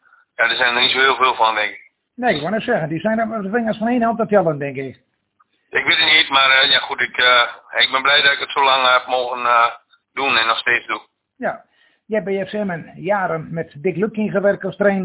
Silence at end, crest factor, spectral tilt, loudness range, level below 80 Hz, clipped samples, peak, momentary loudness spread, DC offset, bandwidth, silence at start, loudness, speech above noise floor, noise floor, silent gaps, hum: 0 s; 16 dB; -7.5 dB/octave; 9 LU; -58 dBFS; under 0.1%; -2 dBFS; 14 LU; under 0.1%; 4 kHz; 0.4 s; -16 LUFS; 45 dB; -63 dBFS; none; none